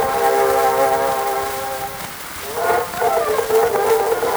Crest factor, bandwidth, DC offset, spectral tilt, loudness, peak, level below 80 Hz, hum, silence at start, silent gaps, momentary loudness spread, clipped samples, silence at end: 14 dB; over 20 kHz; under 0.1%; -2.5 dB/octave; -18 LUFS; -4 dBFS; -48 dBFS; none; 0 s; none; 10 LU; under 0.1%; 0 s